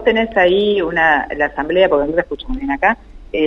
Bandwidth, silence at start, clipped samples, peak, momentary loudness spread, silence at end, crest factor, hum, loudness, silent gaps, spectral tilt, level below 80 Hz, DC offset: 6.6 kHz; 0 s; under 0.1%; 0 dBFS; 11 LU; 0 s; 16 dB; none; -16 LUFS; none; -6.5 dB/octave; -34 dBFS; under 0.1%